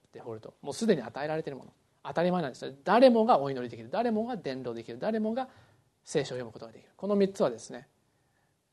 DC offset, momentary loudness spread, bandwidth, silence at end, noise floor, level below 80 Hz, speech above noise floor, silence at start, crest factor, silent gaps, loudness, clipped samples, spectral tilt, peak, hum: under 0.1%; 20 LU; 12 kHz; 0.9 s; -72 dBFS; -74 dBFS; 43 dB; 0.15 s; 22 dB; none; -29 LUFS; under 0.1%; -6 dB/octave; -8 dBFS; none